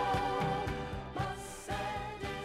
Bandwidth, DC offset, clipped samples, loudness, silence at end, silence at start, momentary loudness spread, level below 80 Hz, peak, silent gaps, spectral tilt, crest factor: 16 kHz; under 0.1%; under 0.1%; -37 LUFS; 0 s; 0 s; 7 LU; -50 dBFS; -22 dBFS; none; -5 dB/octave; 14 dB